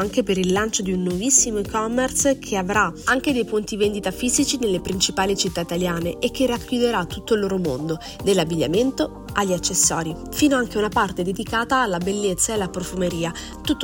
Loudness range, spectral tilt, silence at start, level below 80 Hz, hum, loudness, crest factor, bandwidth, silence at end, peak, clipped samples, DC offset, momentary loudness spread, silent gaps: 2 LU; -3.5 dB/octave; 0 s; -42 dBFS; none; -21 LUFS; 20 dB; 19.5 kHz; 0 s; -2 dBFS; under 0.1%; under 0.1%; 7 LU; none